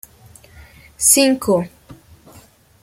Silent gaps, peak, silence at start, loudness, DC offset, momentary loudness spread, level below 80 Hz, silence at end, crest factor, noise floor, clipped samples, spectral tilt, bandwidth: none; 0 dBFS; 1 s; -14 LUFS; under 0.1%; 10 LU; -52 dBFS; 0.9 s; 20 dB; -48 dBFS; under 0.1%; -2.5 dB/octave; 16.5 kHz